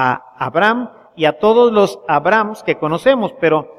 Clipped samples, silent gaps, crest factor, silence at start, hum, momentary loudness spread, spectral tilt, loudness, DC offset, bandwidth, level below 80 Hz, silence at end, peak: under 0.1%; none; 14 dB; 0 s; none; 8 LU; -6 dB/octave; -15 LUFS; under 0.1%; 12.5 kHz; -54 dBFS; 0.1 s; 0 dBFS